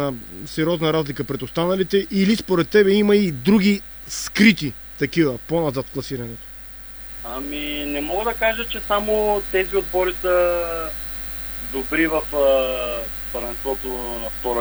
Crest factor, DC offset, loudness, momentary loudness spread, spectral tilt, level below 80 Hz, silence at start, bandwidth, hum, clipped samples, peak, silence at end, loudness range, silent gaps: 20 dB; under 0.1%; -21 LUFS; 13 LU; -5.5 dB/octave; -40 dBFS; 0 s; over 20 kHz; none; under 0.1%; 0 dBFS; 0 s; 7 LU; none